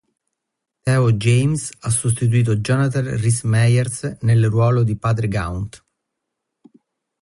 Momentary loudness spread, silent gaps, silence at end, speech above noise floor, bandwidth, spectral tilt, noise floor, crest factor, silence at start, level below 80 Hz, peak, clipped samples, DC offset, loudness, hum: 8 LU; none; 1.45 s; 62 dB; 11.5 kHz; -6 dB/octave; -80 dBFS; 14 dB; 0.85 s; -44 dBFS; -6 dBFS; under 0.1%; under 0.1%; -18 LUFS; none